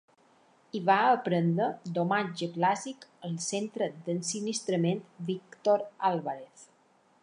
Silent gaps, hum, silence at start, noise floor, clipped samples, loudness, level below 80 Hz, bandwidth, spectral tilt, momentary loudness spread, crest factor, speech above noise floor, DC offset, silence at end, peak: none; none; 0.75 s; -65 dBFS; under 0.1%; -30 LUFS; -82 dBFS; 11 kHz; -5 dB/octave; 11 LU; 20 dB; 36 dB; under 0.1%; 0.6 s; -10 dBFS